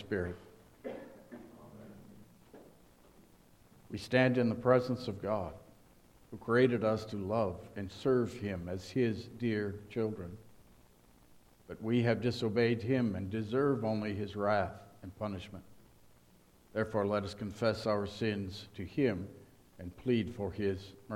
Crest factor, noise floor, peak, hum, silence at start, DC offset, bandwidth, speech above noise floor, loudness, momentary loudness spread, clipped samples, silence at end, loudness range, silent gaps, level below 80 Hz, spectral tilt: 24 dB; -63 dBFS; -12 dBFS; none; 0 s; under 0.1%; 16 kHz; 30 dB; -34 LUFS; 21 LU; under 0.1%; 0 s; 6 LU; none; -64 dBFS; -7 dB/octave